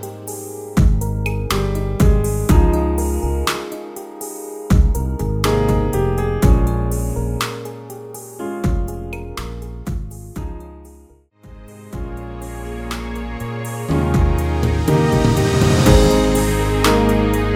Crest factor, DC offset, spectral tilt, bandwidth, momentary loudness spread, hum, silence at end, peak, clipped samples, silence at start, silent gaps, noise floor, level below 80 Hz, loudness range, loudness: 16 dB; under 0.1%; -6 dB/octave; 17.5 kHz; 16 LU; none; 0 s; 0 dBFS; under 0.1%; 0 s; none; -47 dBFS; -22 dBFS; 15 LU; -18 LUFS